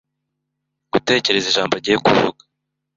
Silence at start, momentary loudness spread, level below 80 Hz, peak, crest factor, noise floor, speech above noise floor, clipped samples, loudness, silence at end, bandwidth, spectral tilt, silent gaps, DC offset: 0.95 s; 7 LU; -56 dBFS; -2 dBFS; 18 dB; -78 dBFS; 61 dB; under 0.1%; -17 LUFS; 0.65 s; 7.8 kHz; -3.5 dB/octave; none; under 0.1%